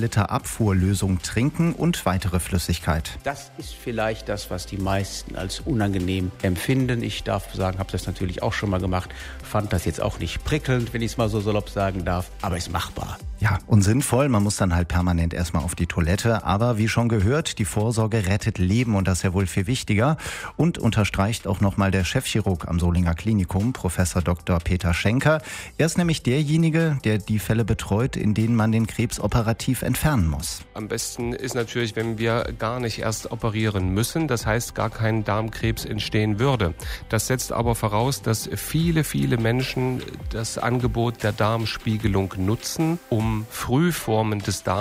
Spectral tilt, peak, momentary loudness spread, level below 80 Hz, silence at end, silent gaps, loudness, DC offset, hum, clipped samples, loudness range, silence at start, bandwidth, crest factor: -5.5 dB/octave; -6 dBFS; 7 LU; -38 dBFS; 0 s; none; -23 LUFS; under 0.1%; none; under 0.1%; 4 LU; 0 s; 16 kHz; 16 dB